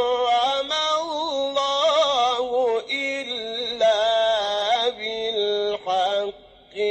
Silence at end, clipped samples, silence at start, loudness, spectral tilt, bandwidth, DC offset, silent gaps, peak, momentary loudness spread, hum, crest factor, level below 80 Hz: 0 s; under 0.1%; 0 s; -22 LUFS; -1.5 dB/octave; 8.8 kHz; under 0.1%; none; -10 dBFS; 8 LU; none; 12 dB; -62 dBFS